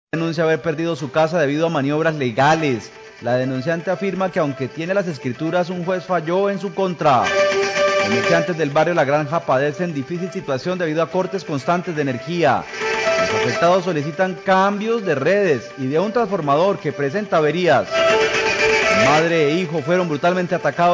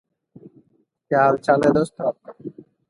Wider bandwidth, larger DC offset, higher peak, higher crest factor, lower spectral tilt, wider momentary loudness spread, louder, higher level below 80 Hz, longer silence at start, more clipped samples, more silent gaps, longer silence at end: second, 7.8 kHz vs 11.5 kHz; neither; about the same, -6 dBFS vs -4 dBFS; second, 12 dB vs 18 dB; second, -5.5 dB/octave vs -7 dB/octave; second, 7 LU vs 21 LU; about the same, -19 LUFS vs -19 LUFS; about the same, -54 dBFS vs -58 dBFS; second, 0.15 s vs 1.1 s; neither; neither; second, 0 s vs 0.4 s